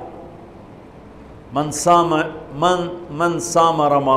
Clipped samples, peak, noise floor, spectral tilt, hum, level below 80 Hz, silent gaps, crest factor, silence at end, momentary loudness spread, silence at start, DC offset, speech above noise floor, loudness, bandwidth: under 0.1%; -4 dBFS; -40 dBFS; -4.5 dB/octave; none; -48 dBFS; none; 16 dB; 0 s; 15 LU; 0 s; under 0.1%; 23 dB; -18 LUFS; 15.5 kHz